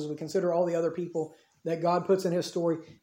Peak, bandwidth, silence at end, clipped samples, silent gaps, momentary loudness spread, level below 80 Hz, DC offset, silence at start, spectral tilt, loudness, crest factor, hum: -14 dBFS; 16.5 kHz; 0.1 s; under 0.1%; none; 9 LU; -76 dBFS; under 0.1%; 0 s; -6.5 dB/octave; -29 LUFS; 16 dB; none